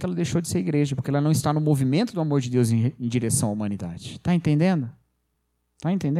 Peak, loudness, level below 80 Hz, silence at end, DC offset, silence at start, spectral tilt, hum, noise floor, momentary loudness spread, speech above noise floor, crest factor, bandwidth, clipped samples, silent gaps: -8 dBFS; -24 LUFS; -54 dBFS; 0 s; under 0.1%; 0 s; -6.5 dB/octave; none; -73 dBFS; 8 LU; 51 dB; 16 dB; 15 kHz; under 0.1%; none